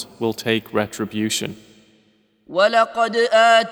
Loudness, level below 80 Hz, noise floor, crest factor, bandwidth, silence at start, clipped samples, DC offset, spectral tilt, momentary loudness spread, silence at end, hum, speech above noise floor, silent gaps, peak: -19 LUFS; -64 dBFS; -60 dBFS; 18 dB; over 20 kHz; 0 s; under 0.1%; under 0.1%; -3.5 dB/octave; 11 LU; 0 s; none; 41 dB; none; -2 dBFS